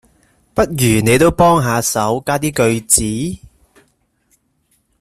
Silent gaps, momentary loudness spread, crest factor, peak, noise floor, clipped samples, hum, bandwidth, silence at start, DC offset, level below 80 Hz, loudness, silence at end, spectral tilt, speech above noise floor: none; 11 LU; 16 dB; 0 dBFS; -62 dBFS; under 0.1%; none; 16 kHz; 0.55 s; under 0.1%; -38 dBFS; -14 LUFS; 1.65 s; -4.5 dB/octave; 48 dB